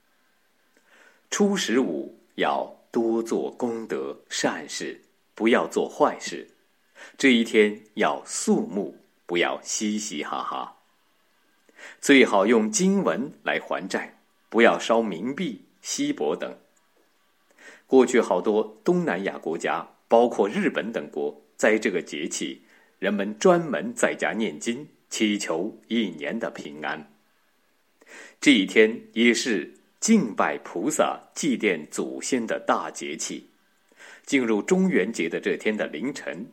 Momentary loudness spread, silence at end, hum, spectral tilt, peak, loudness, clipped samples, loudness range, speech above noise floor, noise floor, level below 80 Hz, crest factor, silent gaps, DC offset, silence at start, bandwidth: 13 LU; 0.05 s; none; -4 dB/octave; -4 dBFS; -24 LUFS; under 0.1%; 5 LU; 44 dB; -68 dBFS; -84 dBFS; 22 dB; none; under 0.1%; 1.3 s; 16.5 kHz